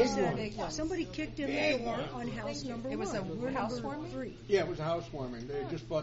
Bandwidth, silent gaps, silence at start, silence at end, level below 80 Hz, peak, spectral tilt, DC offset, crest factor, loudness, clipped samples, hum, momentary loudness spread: 8 kHz; none; 0 s; 0 s; -52 dBFS; -16 dBFS; -4.5 dB/octave; under 0.1%; 18 dB; -35 LUFS; under 0.1%; none; 8 LU